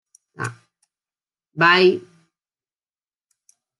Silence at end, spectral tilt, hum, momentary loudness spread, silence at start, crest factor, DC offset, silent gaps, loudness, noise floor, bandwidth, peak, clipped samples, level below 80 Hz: 1.8 s; -5 dB/octave; none; 18 LU; 0.4 s; 22 dB; under 0.1%; none; -16 LUFS; under -90 dBFS; 11 kHz; -2 dBFS; under 0.1%; -74 dBFS